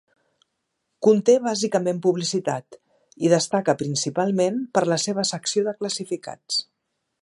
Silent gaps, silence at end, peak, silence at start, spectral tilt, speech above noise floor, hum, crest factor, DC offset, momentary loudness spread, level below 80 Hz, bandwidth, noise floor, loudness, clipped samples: none; 0.6 s; -4 dBFS; 1 s; -4.5 dB/octave; 55 dB; none; 20 dB; under 0.1%; 9 LU; -72 dBFS; 11.5 kHz; -77 dBFS; -22 LUFS; under 0.1%